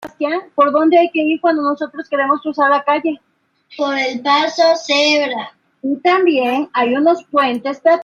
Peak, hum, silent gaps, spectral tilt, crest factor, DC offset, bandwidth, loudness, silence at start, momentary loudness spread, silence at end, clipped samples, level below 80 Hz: -2 dBFS; none; none; -3 dB/octave; 14 dB; under 0.1%; 7.6 kHz; -15 LUFS; 0 s; 10 LU; 0 s; under 0.1%; -70 dBFS